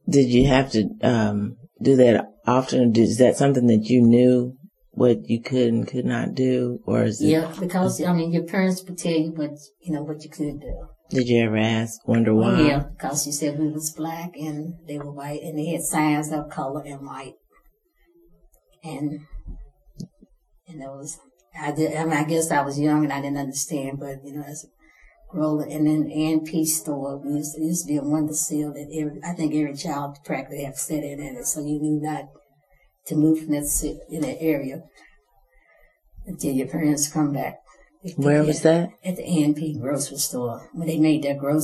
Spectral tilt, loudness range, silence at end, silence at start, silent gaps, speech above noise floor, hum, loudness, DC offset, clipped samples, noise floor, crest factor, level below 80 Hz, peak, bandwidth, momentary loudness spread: -5.5 dB/octave; 10 LU; 0 s; 0.05 s; none; 39 dB; none; -23 LUFS; under 0.1%; under 0.1%; -61 dBFS; 20 dB; -46 dBFS; -2 dBFS; 13.5 kHz; 16 LU